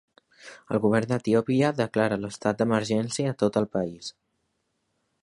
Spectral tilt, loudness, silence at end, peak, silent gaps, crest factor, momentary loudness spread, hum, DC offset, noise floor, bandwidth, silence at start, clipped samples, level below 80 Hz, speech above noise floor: -6 dB/octave; -25 LUFS; 1.1 s; -8 dBFS; none; 20 dB; 7 LU; none; under 0.1%; -76 dBFS; 11.5 kHz; 0.45 s; under 0.1%; -62 dBFS; 51 dB